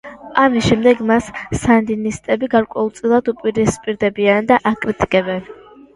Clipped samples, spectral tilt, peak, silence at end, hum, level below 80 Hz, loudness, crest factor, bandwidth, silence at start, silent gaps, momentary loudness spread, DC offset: under 0.1%; -5.5 dB/octave; 0 dBFS; 0.45 s; none; -42 dBFS; -16 LUFS; 16 dB; 11.5 kHz; 0.05 s; none; 8 LU; under 0.1%